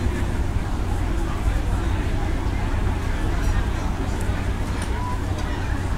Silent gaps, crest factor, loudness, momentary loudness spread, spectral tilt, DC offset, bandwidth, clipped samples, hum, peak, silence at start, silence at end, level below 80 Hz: none; 12 dB; -26 LUFS; 2 LU; -6 dB/octave; under 0.1%; 14.5 kHz; under 0.1%; none; -10 dBFS; 0 s; 0 s; -24 dBFS